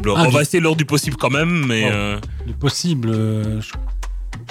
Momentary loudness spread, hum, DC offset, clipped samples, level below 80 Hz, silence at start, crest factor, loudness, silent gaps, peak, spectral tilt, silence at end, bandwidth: 14 LU; none; under 0.1%; under 0.1%; -30 dBFS; 0 s; 12 dB; -18 LUFS; none; -6 dBFS; -5 dB/octave; 0 s; 16 kHz